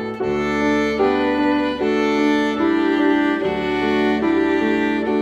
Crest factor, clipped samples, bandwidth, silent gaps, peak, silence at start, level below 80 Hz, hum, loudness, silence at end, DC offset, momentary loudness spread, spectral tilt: 12 dB; under 0.1%; 8.4 kHz; none; -6 dBFS; 0 s; -44 dBFS; none; -18 LUFS; 0 s; under 0.1%; 3 LU; -6 dB/octave